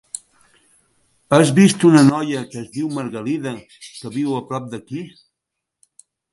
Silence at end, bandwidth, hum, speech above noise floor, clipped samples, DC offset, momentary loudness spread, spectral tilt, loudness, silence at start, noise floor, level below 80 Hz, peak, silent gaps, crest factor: 1.25 s; 11.5 kHz; none; 64 dB; under 0.1%; under 0.1%; 22 LU; -6 dB/octave; -17 LUFS; 0.15 s; -81 dBFS; -62 dBFS; 0 dBFS; none; 18 dB